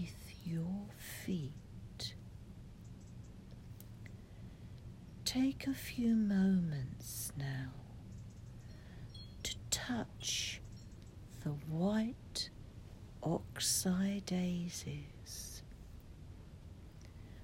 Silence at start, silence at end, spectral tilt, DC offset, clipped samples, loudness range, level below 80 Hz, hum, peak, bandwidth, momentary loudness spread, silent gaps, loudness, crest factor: 0 s; 0 s; -4.5 dB/octave; under 0.1%; under 0.1%; 11 LU; -58 dBFS; none; -20 dBFS; 16 kHz; 21 LU; none; -39 LUFS; 20 dB